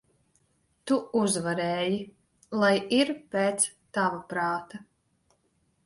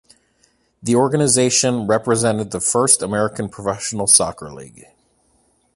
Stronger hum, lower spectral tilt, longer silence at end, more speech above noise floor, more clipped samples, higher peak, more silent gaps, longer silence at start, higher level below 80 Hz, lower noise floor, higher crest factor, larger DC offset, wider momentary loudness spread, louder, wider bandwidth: neither; about the same, -3.5 dB/octave vs -3.5 dB/octave; about the same, 1.05 s vs 1.05 s; about the same, 44 dB vs 43 dB; neither; second, -8 dBFS vs 0 dBFS; neither; about the same, 0.85 s vs 0.85 s; second, -70 dBFS vs -52 dBFS; first, -71 dBFS vs -61 dBFS; about the same, 20 dB vs 20 dB; neither; about the same, 11 LU vs 12 LU; second, -27 LUFS vs -16 LUFS; about the same, 12 kHz vs 12 kHz